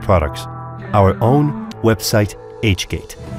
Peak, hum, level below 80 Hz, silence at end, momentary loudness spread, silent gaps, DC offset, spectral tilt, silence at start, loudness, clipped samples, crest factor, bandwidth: -2 dBFS; none; -36 dBFS; 0 s; 13 LU; none; under 0.1%; -6 dB/octave; 0 s; -17 LUFS; under 0.1%; 14 dB; 16 kHz